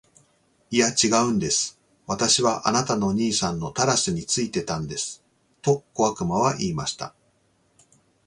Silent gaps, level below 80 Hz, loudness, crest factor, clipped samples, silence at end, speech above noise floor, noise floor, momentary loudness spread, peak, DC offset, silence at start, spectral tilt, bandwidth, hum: none; -54 dBFS; -23 LUFS; 20 dB; under 0.1%; 1.2 s; 42 dB; -65 dBFS; 11 LU; -4 dBFS; under 0.1%; 0.7 s; -3.5 dB/octave; 11.5 kHz; none